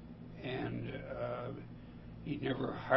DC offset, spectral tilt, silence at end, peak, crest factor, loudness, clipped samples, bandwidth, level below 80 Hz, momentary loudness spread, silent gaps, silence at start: under 0.1%; -5.5 dB/octave; 0 s; -14 dBFS; 24 dB; -41 LUFS; under 0.1%; 5.8 kHz; -58 dBFS; 13 LU; none; 0 s